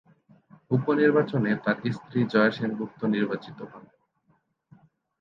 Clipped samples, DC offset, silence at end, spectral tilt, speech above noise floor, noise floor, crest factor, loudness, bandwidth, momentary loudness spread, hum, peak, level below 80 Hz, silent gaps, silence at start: under 0.1%; under 0.1%; 1.4 s; -8.5 dB/octave; 44 dB; -69 dBFS; 18 dB; -25 LUFS; 7.2 kHz; 13 LU; none; -8 dBFS; -70 dBFS; none; 0.7 s